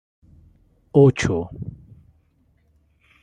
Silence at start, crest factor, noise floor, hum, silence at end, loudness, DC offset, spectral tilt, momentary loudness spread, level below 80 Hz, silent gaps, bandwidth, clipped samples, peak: 0.95 s; 22 dB; -62 dBFS; none; 1.5 s; -19 LUFS; under 0.1%; -7 dB/octave; 21 LU; -48 dBFS; none; 9.6 kHz; under 0.1%; -2 dBFS